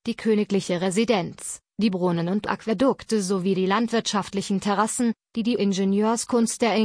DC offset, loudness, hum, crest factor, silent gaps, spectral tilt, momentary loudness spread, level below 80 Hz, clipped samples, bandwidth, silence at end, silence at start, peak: under 0.1%; -24 LUFS; none; 16 dB; none; -5 dB/octave; 5 LU; -62 dBFS; under 0.1%; 10.5 kHz; 0 s; 0.05 s; -8 dBFS